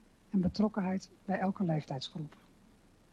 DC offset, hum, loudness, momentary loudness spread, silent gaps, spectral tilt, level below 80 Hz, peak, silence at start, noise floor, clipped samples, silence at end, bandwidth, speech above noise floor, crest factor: under 0.1%; none; -35 LUFS; 10 LU; none; -7.5 dB/octave; -60 dBFS; -18 dBFS; 0.35 s; -63 dBFS; under 0.1%; 0.85 s; 9 kHz; 29 dB; 16 dB